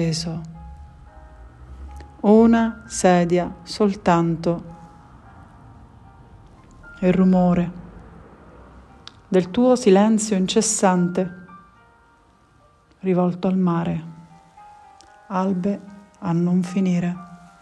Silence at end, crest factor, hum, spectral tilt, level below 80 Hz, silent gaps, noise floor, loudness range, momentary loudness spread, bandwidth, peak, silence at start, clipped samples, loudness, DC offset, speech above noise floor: 0.25 s; 18 dB; none; -6 dB/octave; -48 dBFS; none; -55 dBFS; 6 LU; 20 LU; 12 kHz; -2 dBFS; 0 s; under 0.1%; -20 LUFS; under 0.1%; 37 dB